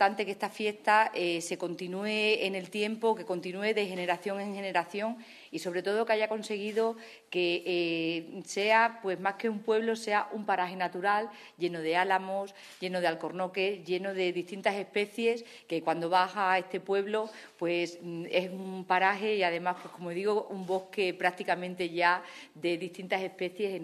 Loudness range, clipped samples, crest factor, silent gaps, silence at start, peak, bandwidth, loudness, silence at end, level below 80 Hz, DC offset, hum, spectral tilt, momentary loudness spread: 3 LU; under 0.1%; 20 dB; none; 0 s; -10 dBFS; 13.5 kHz; -31 LUFS; 0 s; -84 dBFS; under 0.1%; none; -4.5 dB/octave; 9 LU